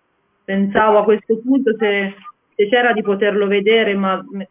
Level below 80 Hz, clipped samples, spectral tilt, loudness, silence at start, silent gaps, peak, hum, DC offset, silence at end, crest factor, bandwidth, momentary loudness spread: -58 dBFS; under 0.1%; -9.5 dB/octave; -16 LUFS; 0.5 s; none; -2 dBFS; none; under 0.1%; 0.05 s; 16 dB; 3.8 kHz; 8 LU